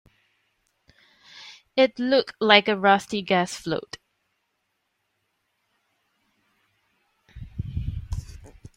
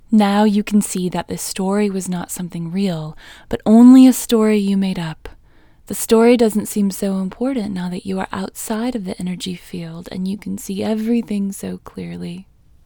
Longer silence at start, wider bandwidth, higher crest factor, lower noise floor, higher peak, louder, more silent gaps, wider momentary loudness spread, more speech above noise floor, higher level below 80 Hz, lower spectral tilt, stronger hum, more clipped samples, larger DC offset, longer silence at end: first, 1.35 s vs 0.1 s; second, 16 kHz vs over 20 kHz; first, 24 dB vs 16 dB; first, -76 dBFS vs -48 dBFS; about the same, -2 dBFS vs 0 dBFS; second, -22 LUFS vs -17 LUFS; neither; first, 25 LU vs 17 LU; first, 54 dB vs 31 dB; about the same, -46 dBFS vs -48 dBFS; second, -4.5 dB/octave vs -6 dB/octave; neither; neither; neither; second, 0.3 s vs 0.45 s